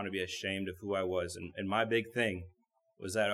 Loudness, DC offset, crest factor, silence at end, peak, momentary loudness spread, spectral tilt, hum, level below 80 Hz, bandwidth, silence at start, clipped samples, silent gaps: -35 LUFS; under 0.1%; 20 dB; 0 s; -14 dBFS; 11 LU; -4.5 dB/octave; none; -66 dBFS; 15 kHz; 0 s; under 0.1%; none